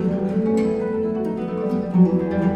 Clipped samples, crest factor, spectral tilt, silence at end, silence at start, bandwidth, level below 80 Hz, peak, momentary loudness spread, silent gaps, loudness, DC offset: under 0.1%; 14 dB; -9.5 dB/octave; 0 s; 0 s; 8.2 kHz; -48 dBFS; -6 dBFS; 7 LU; none; -21 LUFS; under 0.1%